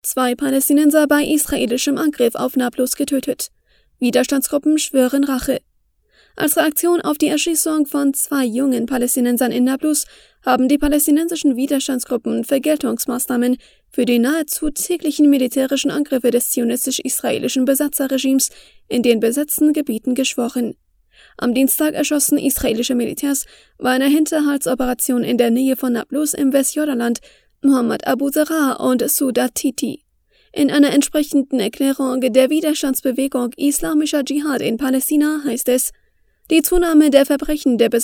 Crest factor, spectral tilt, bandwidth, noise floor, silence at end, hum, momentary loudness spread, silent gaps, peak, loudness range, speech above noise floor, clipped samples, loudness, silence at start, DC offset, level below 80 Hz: 18 dB; -3 dB/octave; over 20 kHz; -61 dBFS; 0 s; none; 6 LU; none; 0 dBFS; 2 LU; 44 dB; under 0.1%; -17 LUFS; 0.05 s; under 0.1%; -44 dBFS